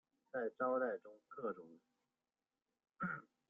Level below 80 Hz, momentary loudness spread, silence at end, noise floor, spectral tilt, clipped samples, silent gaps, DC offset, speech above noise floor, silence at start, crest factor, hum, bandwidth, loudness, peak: -86 dBFS; 15 LU; 0.3 s; under -90 dBFS; -7 dB/octave; under 0.1%; none; under 0.1%; over 47 dB; 0.35 s; 20 dB; none; 3.7 kHz; -43 LUFS; -26 dBFS